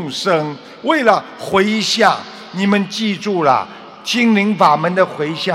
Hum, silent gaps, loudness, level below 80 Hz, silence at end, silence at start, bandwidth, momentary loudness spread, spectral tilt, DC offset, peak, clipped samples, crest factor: none; none; -15 LUFS; -62 dBFS; 0 s; 0 s; 15 kHz; 10 LU; -4.5 dB/octave; under 0.1%; 0 dBFS; under 0.1%; 16 dB